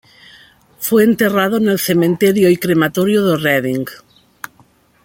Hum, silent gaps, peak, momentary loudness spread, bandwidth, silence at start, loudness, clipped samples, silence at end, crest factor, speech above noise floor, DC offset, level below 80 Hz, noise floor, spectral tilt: none; none; 0 dBFS; 18 LU; 17 kHz; 0.8 s; -14 LUFS; under 0.1%; 1.05 s; 16 dB; 38 dB; under 0.1%; -56 dBFS; -52 dBFS; -5.5 dB/octave